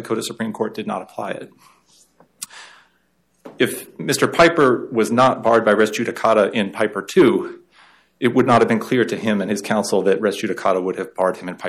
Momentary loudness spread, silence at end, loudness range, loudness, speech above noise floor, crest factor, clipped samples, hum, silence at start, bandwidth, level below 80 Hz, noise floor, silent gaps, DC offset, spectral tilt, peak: 13 LU; 0 s; 12 LU; -18 LUFS; 46 dB; 16 dB; under 0.1%; none; 0 s; 15.5 kHz; -56 dBFS; -64 dBFS; none; under 0.1%; -5 dB/octave; -4 dBFS